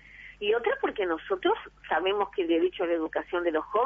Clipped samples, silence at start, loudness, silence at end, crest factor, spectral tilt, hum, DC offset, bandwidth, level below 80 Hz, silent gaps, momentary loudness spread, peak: under 0.1%; 0.15 s; -28 LUFS; 0 s; 14 dB; -6 dB/octave; none; under 0.1%; 3.7 kHz; -60 dBFS; none; 4 LU; -14 dBFS